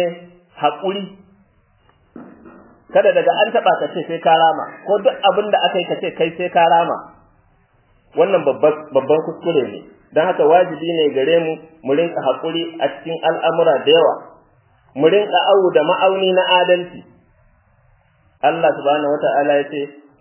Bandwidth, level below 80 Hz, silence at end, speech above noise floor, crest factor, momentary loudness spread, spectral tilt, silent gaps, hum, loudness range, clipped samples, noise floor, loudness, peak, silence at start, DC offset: 3.2 kHz; -64 dBFS; 0.3 s; 40 dB; 16 dB; 11 LU; -8.5 dB/octave; none; none; 4 LU; under 0.1%; -56 dBFS; -16 LUFS; 0 dBFS; 0 s; under 0.1%